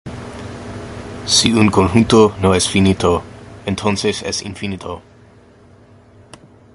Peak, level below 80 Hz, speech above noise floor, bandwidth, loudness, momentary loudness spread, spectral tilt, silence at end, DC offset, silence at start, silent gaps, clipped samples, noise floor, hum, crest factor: 0 dBFS; -36 dBFS; 31 dB; 11.5 kHz; -15 LUFS; 19 LU; -4.5 dB/octave; 1.75 s; under 0.1%; 0.05 s; none; under 0.1%; -46 dBFS; none; 18 dB